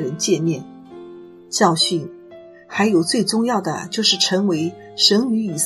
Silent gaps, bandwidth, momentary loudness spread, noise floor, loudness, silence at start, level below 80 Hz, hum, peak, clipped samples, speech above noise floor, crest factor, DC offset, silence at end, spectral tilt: none; 13.5 kHz; 16 LU; -42 dBFS; -18 LUFS; 0 s; -66 dBFS; none; 0 dBFS; under 0.1%; 23 dB; 20 dB; under 0.1%; 0 s; -3.5 dB/octave